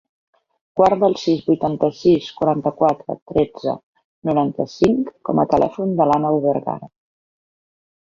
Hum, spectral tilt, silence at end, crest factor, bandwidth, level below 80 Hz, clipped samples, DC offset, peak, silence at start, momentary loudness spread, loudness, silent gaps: none; -7.5 dB/octave; 1.25 s; 18 dB; 7.6 kHz; -52 dBFS; under 0.1%; under 0.1%; -2 dBFS; 0.75 s; 10 LU; -19 LUFS; 3.22-3.26 s, 3.83-3.93 s, 4.04-4.22 s